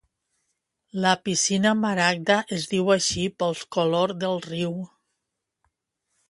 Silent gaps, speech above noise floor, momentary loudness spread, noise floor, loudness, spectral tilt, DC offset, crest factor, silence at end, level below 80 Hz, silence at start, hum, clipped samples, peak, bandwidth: none; 58 dB; 8 LU; -82 dBFS; -23 LUFS; -3.5 dB/octave; under 0.1%; 22 dB; 1.45 s; -60 dBFS; 0.95 s; none; under 0.1%; -4 dBFS; 11.5 kHz